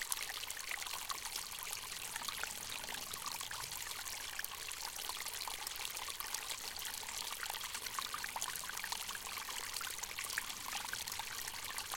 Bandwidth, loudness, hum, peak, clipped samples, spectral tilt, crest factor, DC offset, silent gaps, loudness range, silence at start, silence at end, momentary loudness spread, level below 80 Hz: 17 kHz; -41 LUFS; none; -14 dBFS; under 0.1%; 1 dB/octave; 30 dB; under 0.1%; none; 1 LU; 0 s; 0 s; 2 LU; -66 dBFS